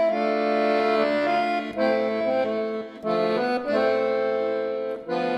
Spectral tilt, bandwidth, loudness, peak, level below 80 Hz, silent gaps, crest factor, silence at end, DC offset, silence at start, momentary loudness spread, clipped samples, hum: -6 dB/octave; 11.5 kHz; -24 LUFS; -10 dBFS; -66 dBFS; none; 14 dB; 0 s; under 0.1%; 0 s; 6 LU; under 0.1%; none